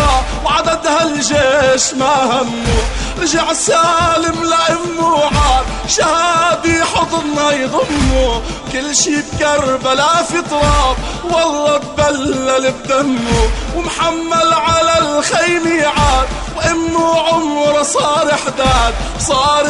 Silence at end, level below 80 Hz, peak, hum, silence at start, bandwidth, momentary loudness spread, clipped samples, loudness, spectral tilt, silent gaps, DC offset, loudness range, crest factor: 0 s; -24 dBFS; 0 dBFS; none; 0 s; 11.5 kHz; 5 LU; under 0.1%; -13 LUFS; -3.5 dB/octave; none; under 0.1%; 2 LU; 12 dB